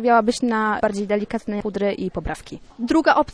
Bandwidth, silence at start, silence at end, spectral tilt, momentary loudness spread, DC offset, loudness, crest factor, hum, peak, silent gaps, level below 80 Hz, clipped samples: 11 kHz; 0 s; 0.05 s; -5.5 dB/octave; 14 LU; under 0.1%; -22 LUFS; 18 dB; none; -2 dBFS; none; -44 dBFS; under 0.1%